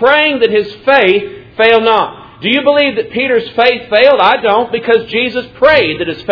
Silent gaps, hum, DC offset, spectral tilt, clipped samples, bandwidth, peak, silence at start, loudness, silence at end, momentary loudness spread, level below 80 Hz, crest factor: none; none; under 0.1%; -6 dB/octave; 0.5%; 5.4 kHz; 0 dBFS; 0 s; -11 LUFS; 0 s; 7 LU; -46 dBFS; 10 dB